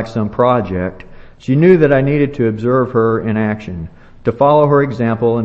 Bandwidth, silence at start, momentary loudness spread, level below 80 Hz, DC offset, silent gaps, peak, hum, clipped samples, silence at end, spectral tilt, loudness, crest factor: 7.6 kHz; 0 s; 14 LU; -40 dBFS; under 0.1%; none; 0 dBFS; none; under 0.1%; 0 s; -9.5 dB/octave; -14 LUFS; 14 dB